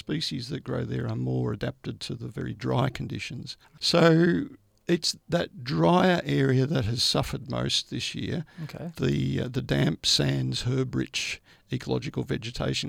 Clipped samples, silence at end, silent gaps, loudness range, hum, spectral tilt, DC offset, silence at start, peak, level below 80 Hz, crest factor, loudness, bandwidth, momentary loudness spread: under 0.1%; 0 s; none; 5 LU; none; -5 dB/octave; under 0.1%; 0.1 s; -8 dBFS; -52 dBFS; 20 dB; -27 LUFS; 16 kHz; 13 LU